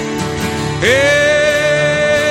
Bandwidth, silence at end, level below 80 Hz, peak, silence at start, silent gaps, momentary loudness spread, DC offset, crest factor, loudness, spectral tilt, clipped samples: 16.5 kHz; 0 s; -38 dBFS; 0 dBFS; 0 s; none; 8 LU; under 0.1%; 12 dB; -13 LUFS; -4 dB/octave; under 0.1%